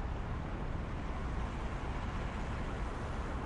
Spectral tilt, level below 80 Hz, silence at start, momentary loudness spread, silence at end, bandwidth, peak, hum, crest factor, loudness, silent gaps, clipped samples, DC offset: -7 dB/octave; -40 dBFS; 0 s; 1 LU; 0 s; 10.5 kHz; -26 dBFS; none; 12 dB; -40 LUFS; none; under 0.1%; under 0.1%